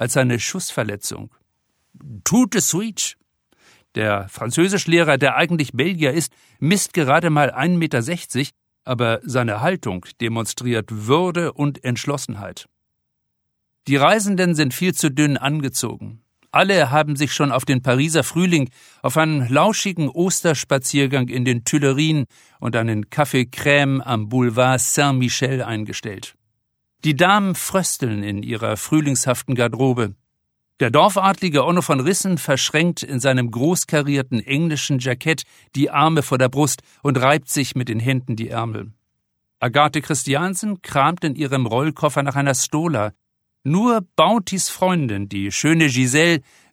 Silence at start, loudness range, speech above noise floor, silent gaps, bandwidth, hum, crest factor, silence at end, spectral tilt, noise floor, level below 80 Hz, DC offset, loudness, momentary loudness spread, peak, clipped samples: 0 s; 4 LU; 56 dB; none; 17 kHz; none; 18 dB; 0.3 s; -4.5 dB/octave; -74 dBFS; -58 dBFS; under 0.1%; -19 LUFS; 9 LU; -2 dBFS; under 0.1%